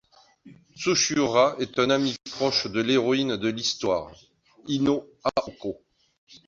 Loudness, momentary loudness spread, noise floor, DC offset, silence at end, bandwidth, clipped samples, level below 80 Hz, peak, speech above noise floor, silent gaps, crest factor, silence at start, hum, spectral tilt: -24 LUFS; 13 LU; -53 dBFS; under 0.1%; 0.1 s; 7.6 kHz; under 0.1%; -60 dBFS; -6 dBFS; 28 dB; 6.18-6.27 s; 20 dB; 0.45 s; none; -3.5 dB/octave